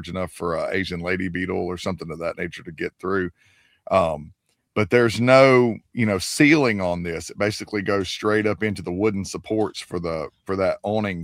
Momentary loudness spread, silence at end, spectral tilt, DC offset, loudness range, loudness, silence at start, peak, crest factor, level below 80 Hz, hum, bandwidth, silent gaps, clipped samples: 14 LU; 0 s; -5.5 dB/octave; under 0.1%; 8 LU; -22 LUFS; 0 s; -2 dBFS; 20 dB; -52 dBFS; none; 16 kHz; none; under 0.1%